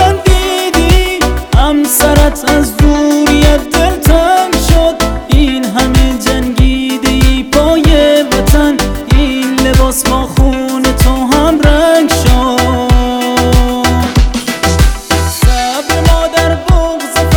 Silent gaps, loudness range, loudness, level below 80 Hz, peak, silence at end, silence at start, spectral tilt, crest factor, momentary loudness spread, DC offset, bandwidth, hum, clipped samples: none; 2 LU; -10 LUFS; -12 dBFS; 0 dBFS; 0 s; 0 s; -5 dB/octave; 8 dB; 4 LU; under 0.1%; over 20 kHz; none; 1%